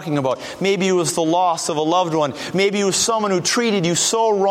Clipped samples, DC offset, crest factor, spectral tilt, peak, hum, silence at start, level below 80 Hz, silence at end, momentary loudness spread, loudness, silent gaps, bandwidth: under 0.1%; under 0.1%; 14 dB; -3.5 dB/octave; -4 dBFS; none; 0 s; -60 dBFS; 0 s; 4 LU; -18 LUFS; none; 16 kHz